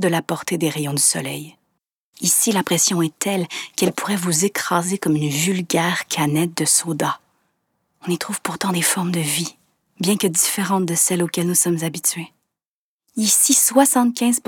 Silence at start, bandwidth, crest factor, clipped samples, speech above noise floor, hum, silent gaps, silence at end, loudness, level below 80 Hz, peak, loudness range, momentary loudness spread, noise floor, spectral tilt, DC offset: 0 s; over 20 kHz; 20 dB; under 0.1%; over 71 dB; none; 1.93-2.13 s, 12.65-12.99 s; 0.1 s; -18 LUFS; -68 dBFS; 0 dBFS; 3 LU; 10 LU; under -90 dBFS; -3 dB/octave; under 0.1%